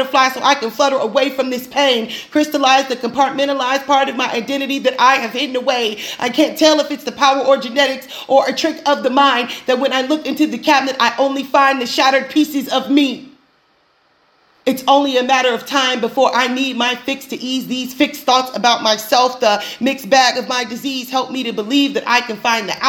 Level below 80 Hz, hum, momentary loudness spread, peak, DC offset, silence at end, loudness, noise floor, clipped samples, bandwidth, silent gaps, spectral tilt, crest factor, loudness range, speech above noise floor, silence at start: -64 dBFS; none; 7 LU; 0 dBFS; under 0.1%; 0 s; -15 LUFS; -57 dBFS; under 0.1%; over 20 kHz; none; -2.5 dB/octave; 16 dB; 2 LU; 42 dB; 0 s